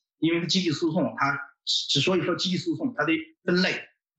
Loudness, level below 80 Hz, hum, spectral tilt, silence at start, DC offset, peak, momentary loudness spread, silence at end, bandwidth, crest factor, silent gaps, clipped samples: -25 LUFS; -70 dBFS; none; -4.5 dB/octave; 0.2 s; under 0.1%; -8 dBFS; 5 LU; 0.35 s; 8.4 kHz; 18 dB; none; under 0.1%